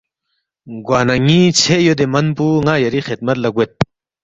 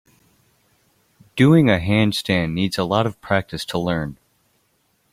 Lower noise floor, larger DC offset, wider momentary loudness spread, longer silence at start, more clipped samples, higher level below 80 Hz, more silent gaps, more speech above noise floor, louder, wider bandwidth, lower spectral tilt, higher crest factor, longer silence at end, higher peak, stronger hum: first, -72 dBFS vs -65 dBFS; neither; about the same, 10 LU vs 11 LU; second, 0.65 s vs 1.35 s; neither; about the same, -46 dBFS vs -48 dBFS; neither; first, 58 dB vs 47 dB; first, -14 LUFS vs -19 LUFS; second, 8.2 kHz vs 15.5 kHz; second, -5 dB/octave vs -6.5 dB/octave; second, 14 dB vs 20 dB; second, 0.4 s vs 1 s; about the same, 0 dBFS vs -2 dBFS; neither